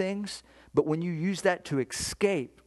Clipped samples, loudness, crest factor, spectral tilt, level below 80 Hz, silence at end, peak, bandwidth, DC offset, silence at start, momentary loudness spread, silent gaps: under 0.1%; -29 LUFS; 20 dB; -5 dB/octave; -58 dBFS; 0.2 s; -10 dBFS; 12.5 kHz; under 0.1%; 0 s; 8 LU; none